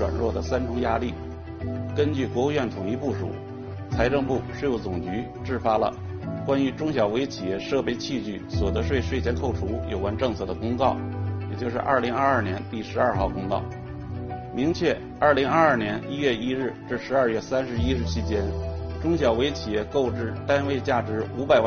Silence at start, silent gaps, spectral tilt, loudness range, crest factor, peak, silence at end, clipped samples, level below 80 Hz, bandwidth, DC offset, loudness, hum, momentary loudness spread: 0 s; none; -5.5 dB/octave; 3 LU; 22 dB; -4 dBFS; 0 s; under 0.1%; -40 dBFS; 6.8 kHz; under 0.1%; -26 LUFS; none; 9 LU